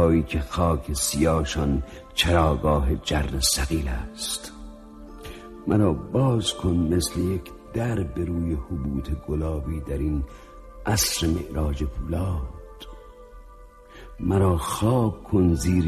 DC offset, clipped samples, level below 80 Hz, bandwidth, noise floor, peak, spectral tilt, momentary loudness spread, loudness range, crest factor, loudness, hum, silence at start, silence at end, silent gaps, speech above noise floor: under 0.1%; under 0.1%; -34 dBFS; 13.5 kHz; -46 dBFS; -6 dBFS; -5 dB/octave; 17 LU; 5 LU; 18 dB; -25 LUFS; none; 0 s; 0 s; none; 23 dB